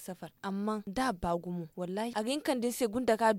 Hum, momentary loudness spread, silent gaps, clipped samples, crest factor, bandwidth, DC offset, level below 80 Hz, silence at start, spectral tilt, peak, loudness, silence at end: none; 8 LU; none; under 0.1%; 18 dB; 16.5 kHz; under 0.1%; -58 dBFS; 0 s; -5 dB/octave; -14 dBFS; -34 LUFS; 0 s